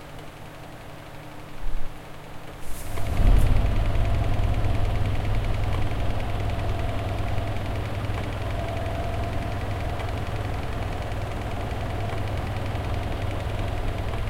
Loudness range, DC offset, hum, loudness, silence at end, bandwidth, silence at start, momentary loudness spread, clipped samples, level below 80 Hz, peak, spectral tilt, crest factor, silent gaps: 4 LU; under 0.1%; none; -29 LUFS; 0 s; 15.5 kHz; 0 s; 15 LU; under 0.1%; -28 dBFS; -8 dBFS; -6.5 dB/octave; 18 dB; none